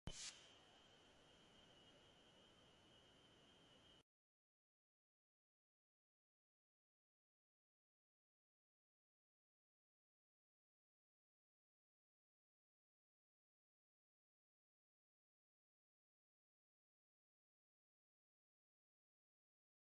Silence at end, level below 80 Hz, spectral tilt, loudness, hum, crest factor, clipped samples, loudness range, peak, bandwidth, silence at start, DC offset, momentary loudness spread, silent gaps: 16 s; -82 dBFS; -2 dB/octave; -63 LUFS; none; 32 dB; under 0.1%; 7 LU; -38 dBFS; 11 kHz; 0.05 s; under 0.1%; 15 LU; none